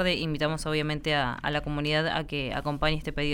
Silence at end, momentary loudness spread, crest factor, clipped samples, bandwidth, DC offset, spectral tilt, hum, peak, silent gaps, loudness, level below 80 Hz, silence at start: 0 s; 4 LU; 16 dB; under 0.1%; 16.5 kHz; under 0.1%; -5.5 dB/octave; none; -12 dBFS; none; -28 LUFS; -40 dBFS; 0 s